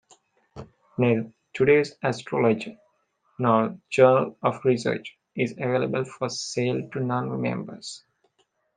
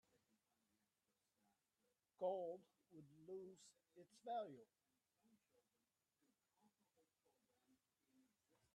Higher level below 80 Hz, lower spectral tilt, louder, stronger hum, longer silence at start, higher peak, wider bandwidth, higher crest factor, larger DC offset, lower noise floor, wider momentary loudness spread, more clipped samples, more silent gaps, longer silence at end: first, -66 dBFS vs under -90 dBFS; about the same, -6 dB/octave vs -5.5 dB/octave; first, -24 LUFS vs -52 LUFS; neither; second, 0.55 s vs 2.2 s; first, -4 dBFS vs -34 dBFS; about the same, 9.8 kHz vs 10 kHz; about the same, 22 dB vs 24 dB; neither; second, -70 dBFS vs under -90 dBFS; second, 18 LU vs 21 LU; neither; neither; second, 0.8 s vs 4.1 s